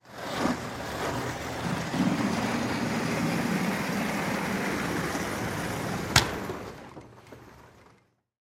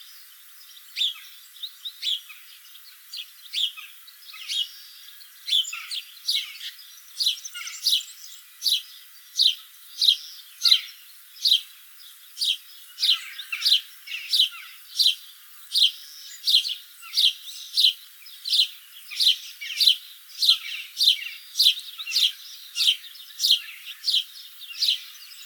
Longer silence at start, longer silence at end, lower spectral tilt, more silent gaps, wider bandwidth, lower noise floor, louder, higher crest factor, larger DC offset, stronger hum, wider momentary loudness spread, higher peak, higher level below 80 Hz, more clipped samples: about the same, 0.05 s vs 0 s; first, 0.7 s vs 0 s; first, -4.5 dB/octave vs 12 dB/octave; neither; second, 16 kHz vs over 20 kHz; first, -64 dBFS vs -47 dBFS; second, -29 LUFS vs -22 LUFS; first, 30 dB vs 24 dB; neither; neither; second, 16 LU vs 22 LU; first, 0 dBFS vs -4 dBFS; first, -50 dBFS vs under -90 dBFS; neither